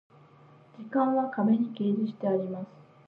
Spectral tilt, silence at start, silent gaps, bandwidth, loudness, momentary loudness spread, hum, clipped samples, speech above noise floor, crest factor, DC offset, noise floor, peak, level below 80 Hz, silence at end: -10.5 dB/octave; 0.8 s; none; 4.4 kHz; -28 LUFS; 14 LU; none; under 0.1%; 28 dB; 14 dB; under 0.1%; -56 dBFS; -14 dBFS; -82 dBFS; 0.4 s